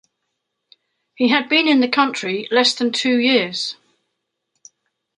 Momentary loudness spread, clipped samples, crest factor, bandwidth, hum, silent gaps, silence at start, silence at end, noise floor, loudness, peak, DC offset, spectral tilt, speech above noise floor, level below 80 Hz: 8 LU; under 0.1%; 18 dB; 11 kHz; none; none; 1.2 s; 1.45 s; -76 dBFS; -17 LUFS; -2 dBFS; under 0.1%; -3 dB/octave; 59 dB; -72 dBFS